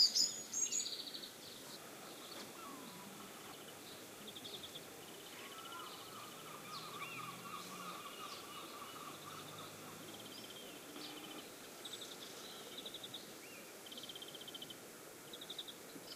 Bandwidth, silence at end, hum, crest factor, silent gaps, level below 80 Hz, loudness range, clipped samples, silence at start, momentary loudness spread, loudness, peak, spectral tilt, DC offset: 16 kHz; 0 s; none; 28 dB; none; -84 dBFS; 5 LU; under 0.1%; 0 s; 10 LU; -46 LUFS; -20 dBFS; -0.5 dB/octave; under 0.1%